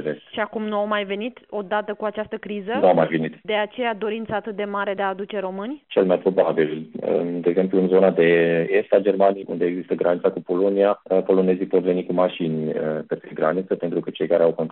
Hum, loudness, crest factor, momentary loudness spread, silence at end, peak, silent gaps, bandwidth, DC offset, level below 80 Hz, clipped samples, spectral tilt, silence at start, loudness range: none; -22 LUFS; 18 dB; 10 LU; 0 s; -4 dBFS; none; 4.2 kHz; under 0.1%; -68 dBFS; under 0.1%; -5 dB/octave; 0 s; 4 LU